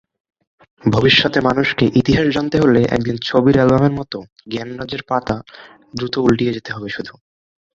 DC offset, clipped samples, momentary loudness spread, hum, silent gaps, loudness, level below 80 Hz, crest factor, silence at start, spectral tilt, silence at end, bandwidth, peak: under 0.1%; under 0.1%; 15 LU; none; 4.32-4.36 s; -16 LUFS; -42 dBFS; 16 dB; 0.85 s; -6.5 dB/octave; 0.65 s; 7.6 kHz; 0 dBFS